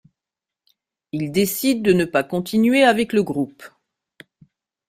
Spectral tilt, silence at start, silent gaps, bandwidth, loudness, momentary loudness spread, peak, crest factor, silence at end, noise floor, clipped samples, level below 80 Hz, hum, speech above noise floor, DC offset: -5 dB/octave; 1.15 s; none; 16 kHz; -19 LUFS; 12 LU; -4 dBFS; 18 dB; 1.2 s; -87 dBFS; under 0.1%; -58 dBFS; none; 69 dB; under 0.1%